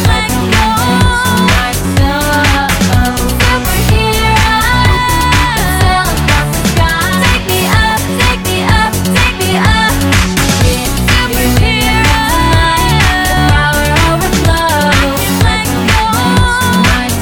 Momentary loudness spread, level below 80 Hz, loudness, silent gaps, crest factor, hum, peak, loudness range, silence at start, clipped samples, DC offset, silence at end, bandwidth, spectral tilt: 2 LU; -18 dBFS; -10 LUFS; none; 10 dB; none; 0 dBFS; 1 LU; 0 s; under 0.1%; 0.4%; 0 s; 19 kHz; -4 dB/octave